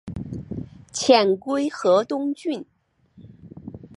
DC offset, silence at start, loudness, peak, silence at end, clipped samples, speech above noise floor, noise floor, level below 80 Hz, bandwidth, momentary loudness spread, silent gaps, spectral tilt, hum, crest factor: under 0.1%; 0.05 s; -22 LUFS; -2 dBFS; 0.1 s; under 0.1%; 32 dB; -54 dBFS; -52 dBFS; 11.5 kHz; 19 LU; none; -4.5 dB/octave; none; 22 dB